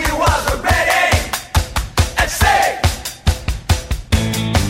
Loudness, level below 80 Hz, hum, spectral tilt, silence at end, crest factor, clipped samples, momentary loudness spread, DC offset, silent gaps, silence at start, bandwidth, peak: -16 LUFS; -22 dBFS; none; -4 dB/octave; 0 s; 16 dB; under 0.1%; 7 LU; under 0.1%; none; 0 s; 16.5 kHz; 0 dBFS